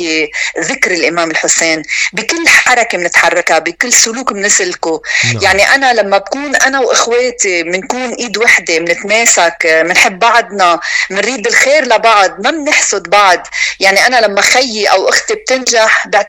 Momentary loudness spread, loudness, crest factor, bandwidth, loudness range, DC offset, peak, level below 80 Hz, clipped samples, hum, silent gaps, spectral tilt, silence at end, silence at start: 7 LU; -9 LUFS; 10 dB; over 20 kHz; 1 LU; under 0.1%; 0 dBFS; -48 dBFS; 0.2%; none; none; -1 dB/octave; 0 s; 0 s